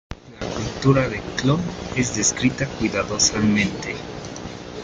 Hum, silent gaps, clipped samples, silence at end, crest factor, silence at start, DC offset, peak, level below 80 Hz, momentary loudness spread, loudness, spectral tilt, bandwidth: none; none; under 0.1%; 0 s; 18 dB; 0.1 s; under 0.1%; -4 dBFS; -42 dBFS; 15 LU; -21 LUFS; -4 dB/octave; 9.6 kHz